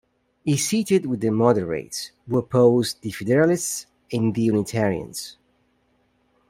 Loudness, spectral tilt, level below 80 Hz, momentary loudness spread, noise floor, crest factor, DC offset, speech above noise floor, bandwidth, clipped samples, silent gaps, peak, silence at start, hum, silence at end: -22 LUFS; -5.5 dB/octave; -58 dBFS; 13 LU; -65 dBFS; 20 dB; under 0.1%; 44 dB; 16 kHz; under 0.1%; none; -4 dBFS; 0.45 s; none; 1.15 s